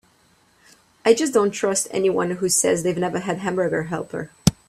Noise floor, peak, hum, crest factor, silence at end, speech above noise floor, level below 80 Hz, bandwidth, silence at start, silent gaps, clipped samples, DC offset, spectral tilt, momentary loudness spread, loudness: -59 dBFS; 0 dBFS; none; 22 dB; 0.15 s; 38 dB; -48 dBFS; 15 kHz; 1.05 s; none; under 0.1%; under 0.1%; -4 dB/octave; 7 LU; -21 LUFS